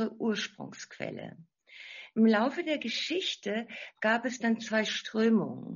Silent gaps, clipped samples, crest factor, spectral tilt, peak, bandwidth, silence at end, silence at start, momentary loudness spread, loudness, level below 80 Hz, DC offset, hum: none; under 0.1%; 18 dB; -3 dB/octave; -14 dBFS; 7.2 kHz; 0 s; 0 s; 18 LU; -30 LUFS; -78 dBFS; under 0.1%; none